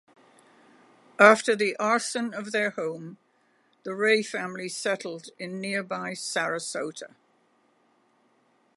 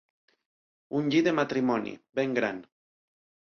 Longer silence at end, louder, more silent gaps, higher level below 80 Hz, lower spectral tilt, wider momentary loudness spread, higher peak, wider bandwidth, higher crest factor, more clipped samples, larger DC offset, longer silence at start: first, 1.7 s vs 0.9 s; about the same, -26 LUFS vs -28 LUFS; neither; second, -82 dBFS vs -72 dBFS; second, -3.5 dB/octave vs -6 dB/octave; first, 20 LU vs 10 LU; first, -2 dBFS vs -12 dBFS; first, 11.5 kHz vs 6.8 kHz; first, 26 dB vs 18 dB; neither; neither; first, 1.2 s vs 0.9 s